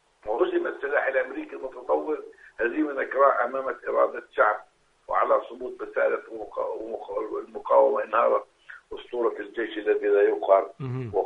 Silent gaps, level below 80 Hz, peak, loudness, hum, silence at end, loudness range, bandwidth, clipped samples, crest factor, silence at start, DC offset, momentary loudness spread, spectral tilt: none; -64 dBFS; -6 dBFS; -26 LUFS; none; 0 s; 3 LU; 4.4 kHz; under 0.1%; 20 dB; 0.25 s; under 0.1%; 14 LU; -7.5 dB/octave